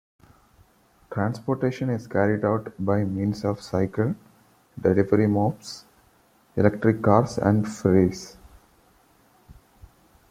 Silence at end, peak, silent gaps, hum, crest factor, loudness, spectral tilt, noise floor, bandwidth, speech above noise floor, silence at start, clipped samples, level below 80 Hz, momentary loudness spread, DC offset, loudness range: 0.8 s; -2 dBFS; none; none; 22 dB; -24 LUFS; -7.5 dB/octave; -60 dBFS; 14 kHz; 37 dB; 1.1 s; under 0.1%; -56 dBFS; 14 LU; under 0.1%; 3 LU